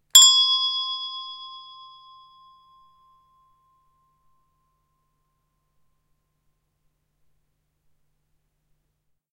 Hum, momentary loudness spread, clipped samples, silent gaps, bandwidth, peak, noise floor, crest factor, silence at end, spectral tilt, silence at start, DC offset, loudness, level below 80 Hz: none; 28 LU; under 0.1%; none; 16 kHz; 0 dBFS; -74 dBFS; 28 dB; 7.75 s; 5.5 dB/octave; 0.15 s; under 0.1%; -16 LUFS; -76 dBFS